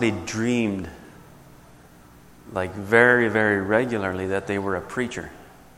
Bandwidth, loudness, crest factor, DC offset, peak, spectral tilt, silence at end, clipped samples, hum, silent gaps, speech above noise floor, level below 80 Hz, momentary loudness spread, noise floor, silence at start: 16 kHz; -22 LUFS; 24 dB; under 0.1%; -2 dBFS; -5.5 dB/octave; 0.3 s; under 0.1%; none; none; 27 dB; -54 dBFS; 16 LU; -49 dBFS; 0 s